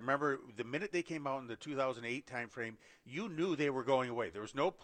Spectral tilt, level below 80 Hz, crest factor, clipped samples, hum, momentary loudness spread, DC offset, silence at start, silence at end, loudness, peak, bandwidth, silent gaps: -5.5 dB/octave; -76 dBFS; 20 dB; under 0.1%; none; 9 LU; under 0.1%; 0 s; 0 s; -38 LUFS; -18 dBFS; 9.4 kHz; none